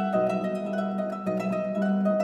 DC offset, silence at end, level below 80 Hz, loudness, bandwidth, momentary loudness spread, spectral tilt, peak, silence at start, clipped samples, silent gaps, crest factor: under 0.1%; 0 s; -70 dBFS; -28 LUFS; 8.8 kHz; 4 LU; -8.5 dB/octave; -12 dBFS; 0 s; under 0.1%; none; 14 dB